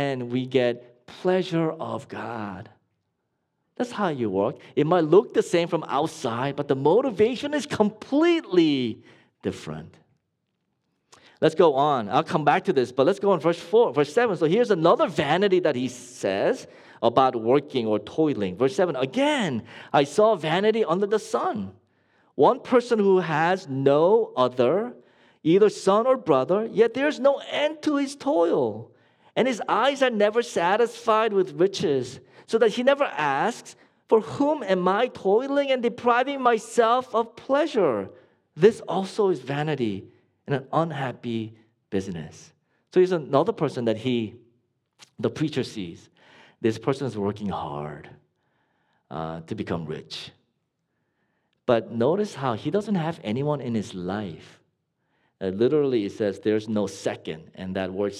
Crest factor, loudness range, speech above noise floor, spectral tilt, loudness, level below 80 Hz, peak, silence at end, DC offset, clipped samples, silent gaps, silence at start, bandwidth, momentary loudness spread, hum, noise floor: 20 dB; 8 LU; 53 dB; -6 dB/octave; -24 LUFS; -68 dBFS; -4 dBFS; 0 s; under 0.1%; under 0.1%; none; 0 s; 12 kHz; 13 LU; none; -77 dBFS